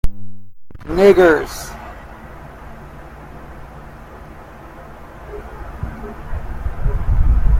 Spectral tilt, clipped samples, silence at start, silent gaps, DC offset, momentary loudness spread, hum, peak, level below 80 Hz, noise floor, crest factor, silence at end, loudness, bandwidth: -7 dB/octave; under 0.1%; 0.05 s; none; under 0.1%; 25 LU; none; 0 dBFS; -22 dBFS; -36 dBFS; 18 dB; 0 s; -17 LUFS; 15.5 kHz